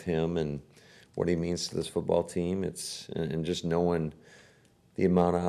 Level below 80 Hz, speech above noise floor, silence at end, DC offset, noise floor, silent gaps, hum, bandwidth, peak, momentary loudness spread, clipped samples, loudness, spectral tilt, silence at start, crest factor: -54 dBFS; 32 dB; 0 s; under 0.1%; -62 dBFS; none; none; 13 kHz; -12 dBFS; 10 LU; under 0.1%; -30 LUFS; -6 dB/octave; 0 s; 18 dB